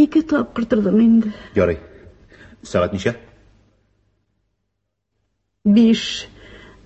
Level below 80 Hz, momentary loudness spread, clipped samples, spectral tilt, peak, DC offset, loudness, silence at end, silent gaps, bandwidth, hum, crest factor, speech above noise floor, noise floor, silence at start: -44 dBFS; 13 LU; under 0.1%; -6.5 dB/octave; -2 dBFS; under 0.1%; -18 LUFS; 0.3 s; none; 8.2 kHz; none; 16 dB; 59 dB; -75 dBFS; 0 s